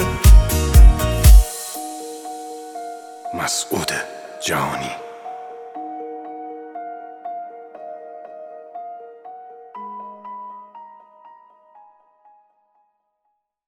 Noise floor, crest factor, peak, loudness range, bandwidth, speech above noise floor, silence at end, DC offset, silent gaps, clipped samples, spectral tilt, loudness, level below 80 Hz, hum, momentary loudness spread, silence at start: -73 dBFS; 20 dB; 0 dBFS; 21 LU; 19 kHz; 50 dB; 2.9 s; under 0.1%; none; under 0.1%; -4.5 dB/octave; -18 LUFS; -20 dBFS; none; 24 LU; 0 s